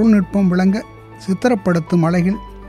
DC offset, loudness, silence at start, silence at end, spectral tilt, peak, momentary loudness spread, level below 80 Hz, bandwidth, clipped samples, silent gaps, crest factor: under 0.1%; -17 LUFS; 0 s; 0 s; -8 dB/octave; -2 dBFS; 9 LU; -42 dBFS; 11 kHz; under 0.1%; none; 14 dB